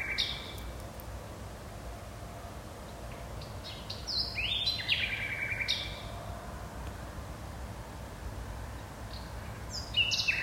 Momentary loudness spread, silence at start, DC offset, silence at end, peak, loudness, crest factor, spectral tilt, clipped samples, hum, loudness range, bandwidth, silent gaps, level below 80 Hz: 15 LU; 0 s; under 0.1%; 0 s; -16 dBFS; -35 LUFS; 20 dB; -3 dB/octave; under 0.1%; none; 11 LU; 16 kHz; none; -46 dBFS